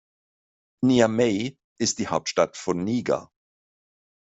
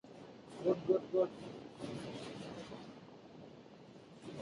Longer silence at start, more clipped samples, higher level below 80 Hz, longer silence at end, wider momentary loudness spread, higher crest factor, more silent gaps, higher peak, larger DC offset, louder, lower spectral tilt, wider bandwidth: first, 0.8 s vs 0.05 s; neither; first, -62 dBFS vs -74 dBFS; first, 1.1 s vs 0 s; second, 9 LU vs 22 LU; about the same, 22 dB vs 22 dB; first, 1.64-1.76 s vs none; first, -4 dBFS vs -20 dBFS; neither; first, -24 LUFS vs -40 LUFS; second, -4.5 dB/octave vs -6.5 dB/octave; second, 8.2 kHz vs 11 kHz